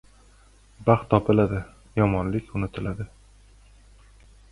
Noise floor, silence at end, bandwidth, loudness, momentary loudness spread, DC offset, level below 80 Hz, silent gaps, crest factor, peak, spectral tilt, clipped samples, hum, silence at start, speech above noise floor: -54 dBFS; 1.45 s; 11 kHz; -24 LUFS; 12 LU; under 0.1%; -44 dBFS; none; 24 dB; -2 dBFS; -9 dB/octave; under 0.1%; none; 0.8 s; 32 dB